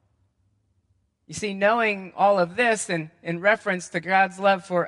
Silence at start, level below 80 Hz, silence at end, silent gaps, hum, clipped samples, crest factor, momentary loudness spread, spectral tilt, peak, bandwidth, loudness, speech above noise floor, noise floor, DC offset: 1.3 s; -68 dBFS; 0 s; none; none; under 0.1%; 20 dB; 10 LU; -4 dB/octave; -6 dBFS; 11.5 kHz; -23 LUFS; 46 dB; -69 dBFS; under 0.1%